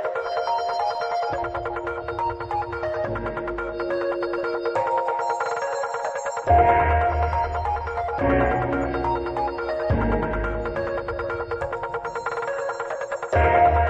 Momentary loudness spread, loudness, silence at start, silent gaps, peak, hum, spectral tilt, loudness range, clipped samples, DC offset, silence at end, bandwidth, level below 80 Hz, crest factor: 9 LU; -24 LUFS; 0 s; none; -6 dBFS; none; -6.5 dB/octave; 5 LU; under 0.1%; under 0.1%; 0 s; 8.4 kHz; -36 dBFS; 18 dB